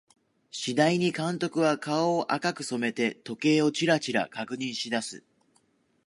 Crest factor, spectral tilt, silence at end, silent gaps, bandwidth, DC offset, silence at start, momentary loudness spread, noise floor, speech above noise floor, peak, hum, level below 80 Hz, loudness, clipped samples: 20 dB; -4.5 dB/octave; 0.85 s; none; 11.5 kHz; under 0.1%; 0.55 s; 9 LU; -68 dBFS; 41 dB; -8 dBFS; none; -76 dBFS; -27 LUFS; under 0.1%